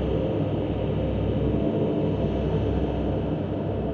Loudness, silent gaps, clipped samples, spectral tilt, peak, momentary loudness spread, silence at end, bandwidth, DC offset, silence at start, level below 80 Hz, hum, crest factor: -26 LUFS; none; under 0.1%; -10 dB/octave; -12 dBFS; 3 LU; 0 s; 6.4 kHz; under 0.1%; 0 s; -34 dBFS; none; 12 dB